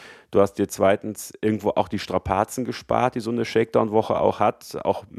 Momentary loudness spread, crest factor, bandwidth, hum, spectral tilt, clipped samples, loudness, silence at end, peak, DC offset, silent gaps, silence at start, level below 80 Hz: 6 LU; 18 dB; 15 kHz; none; -5.5 dB/octave; under 0.1%; -23 LUFS; 0 s; -4 dBFS; under 0.1%; none; 0 s; -50 dBFS